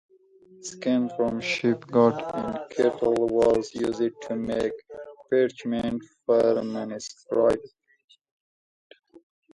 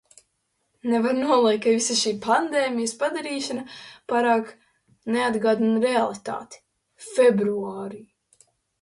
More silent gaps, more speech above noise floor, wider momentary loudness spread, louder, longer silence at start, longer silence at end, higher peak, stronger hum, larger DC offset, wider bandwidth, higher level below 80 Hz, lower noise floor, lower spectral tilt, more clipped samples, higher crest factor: first, 8.04-8.08 s, 8.31-8.90 s vs none; second, 30 dB vs 51 dB; second, 11 LU vs 16 LU; about the same, -25 LUFS vs -23 LUFS; second, 0.6 s vs 0.85 s; second, 0.35 s vs 0.8 s; about the same, -6 dBFS vs -8 dBFS; neither; neither; about the same, 11.5 kHz vs 11.5 kHz; first, -58 dBFS vs -70 dBFS; second, -55 dBFS vs -73 dBFS; first, -5.5 dB/octave vs -3.5 dB/octave; neither; about the same, 20 dB vs 16 dB